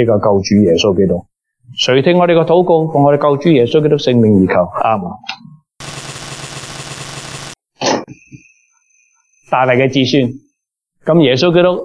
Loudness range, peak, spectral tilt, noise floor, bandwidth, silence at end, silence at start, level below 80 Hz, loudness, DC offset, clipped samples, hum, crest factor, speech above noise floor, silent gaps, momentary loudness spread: 12 LU; 0 dBFS; -6 dB/octave; -71 dBFS; 11 kHz; 0 s; 0 s; -50 dBFS; -12 LUFS; under 0.1%; under 0.1%; none; 12 dB; 60 dB; none; 16 LU